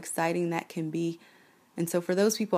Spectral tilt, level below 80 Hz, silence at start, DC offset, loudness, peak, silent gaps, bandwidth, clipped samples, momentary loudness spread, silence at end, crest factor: -5 dB/octave; -78 dBFS; 0 s; under 0.1%; -30 LUFS; -14 dBFS; none; 15.5 kHz; under 0.1%; 10 LU; 0 s; 16 dB